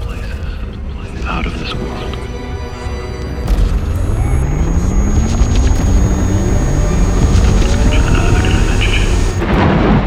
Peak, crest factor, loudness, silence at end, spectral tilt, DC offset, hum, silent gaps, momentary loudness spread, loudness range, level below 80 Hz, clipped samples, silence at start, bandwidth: 0 dBFS; 12 dB; -16 LUFS; 0 s; -6 dB/octave; under 0.1%; none; none; 11 LU; 8 LU; -16 dBFS; under 0.1%; 0 s; 11.5 kHz